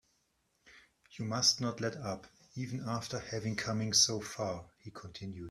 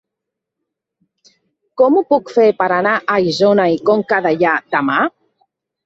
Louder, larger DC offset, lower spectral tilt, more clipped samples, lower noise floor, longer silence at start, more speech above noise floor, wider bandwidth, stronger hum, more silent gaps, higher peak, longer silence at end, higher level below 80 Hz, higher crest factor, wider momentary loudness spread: second, -33 LUFS vs -14 LUFS; neither; second, -3 dB/octave vs -6 dB/octave; neither; second, -77 dBFS vs -81 dBFS; second, 0.65 s vs 1.75 s; second, 41 dB vs 67 dB; first, 14 kHz vs 7.8 kHz; neither; neither; second, -14 dBFS vs 0 dBFS; second, 0 s vs 0.75 s; second, -68 dBFS vs -62 dBFS; first, 22 dB vs 16 dB; first, 18 LU vs 4 LU